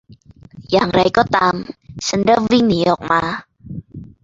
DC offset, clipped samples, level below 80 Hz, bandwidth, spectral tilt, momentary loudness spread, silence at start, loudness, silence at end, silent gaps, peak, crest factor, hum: under 0.1%; under 0.1%; -46 dBFS; 7.8 kHz; -5 dB/octave; 19 LU; 0.1 s; -16 LUFS; 0.15 s; none; 0 dBFS; 18 dB; none